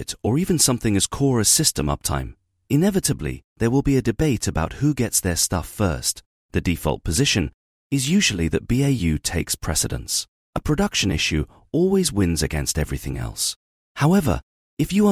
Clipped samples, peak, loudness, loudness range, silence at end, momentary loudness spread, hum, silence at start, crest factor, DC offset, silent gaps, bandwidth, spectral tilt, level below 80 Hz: under 0.1%; -4 dBFS; -21 LUFS; 2 LU; 0 s; 9 LU; none; 0 s; 18 dB; under 0.1%; 3.44-3.56 s, 6.26-6.49 s, 7.54-7.90 s, 10.28-10.53 s, 13.56-13.95 s, 14.43-14.77 s; 18.5 kHz; -4 dB/octave; -36 dBFS